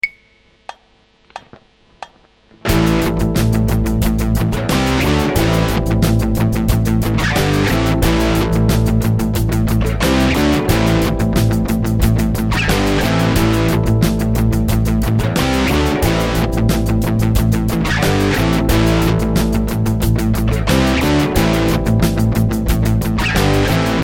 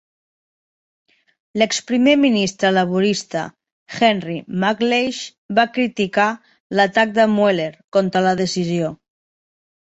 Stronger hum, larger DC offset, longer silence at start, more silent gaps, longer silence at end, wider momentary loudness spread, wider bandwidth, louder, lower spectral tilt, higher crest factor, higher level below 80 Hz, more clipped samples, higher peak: neither; neither; second, 0.05 s vs 1.55 s; second, none vs 3.72-3.86 s, 5.38-5.49 s, 6.60-6.70 s, 7.84-7.92 s; second, 0 s vs 0.85 s; second, 3 LU vs 11 LU; first, 17.5 kHz vs 8.2 kHz; first, -15 LUFS vs -18 LUFS; first, -6 dB/octave vs -4.5 dB/octave; about the same, 14 dB vs 18 dB; first, -22 dBFS vs -62 dBFS; neither; about the same, 0 dBFS vs -2 dBFS